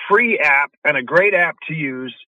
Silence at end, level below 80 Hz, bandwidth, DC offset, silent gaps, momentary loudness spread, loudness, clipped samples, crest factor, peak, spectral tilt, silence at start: 0.15 s; -68 dBFS; 11 kHz; under 0.1%; 0.77-0.82 s; 11 LU; -16 LUFS; under 0.1%; 16 dB; -2 dBFS; -6 dB/octave; 0 s